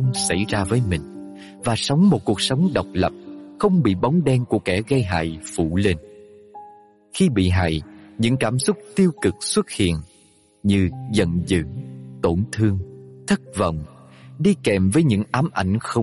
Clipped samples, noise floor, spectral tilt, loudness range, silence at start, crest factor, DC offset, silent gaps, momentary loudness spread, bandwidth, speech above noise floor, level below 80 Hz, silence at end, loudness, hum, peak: under 0.1%; -55 dBFS; -6 dB/octave; 3 LU; 0 s; 16 dB; under 0.1%; none; 12 LU; 11.5 kHz; 35 dB; -44 dBFS; 0 s; -21 LUFS; none; -6 dBFS